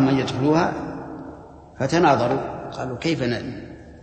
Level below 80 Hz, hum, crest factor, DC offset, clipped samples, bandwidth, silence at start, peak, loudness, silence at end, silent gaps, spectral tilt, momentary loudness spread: -48 dBFS; none; 18 dB; under 0.1%; under 0.1%; 8.8 kHz; 0 s; -4 dBFS; -22 LUFS; 0 s; none; -6.5 dB/octave; 19 LU